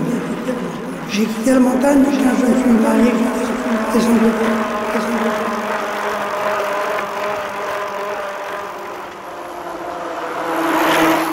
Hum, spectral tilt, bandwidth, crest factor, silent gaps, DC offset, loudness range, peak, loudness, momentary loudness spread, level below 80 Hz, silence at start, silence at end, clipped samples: none; -5 dB/octave; 16 kHz; 14 dB; none; under 0.1%; 9 LU; -4 dBFS; -18 LUFS; 13 LU; -48 dBFS; 0 s; 0 s; under 0.1%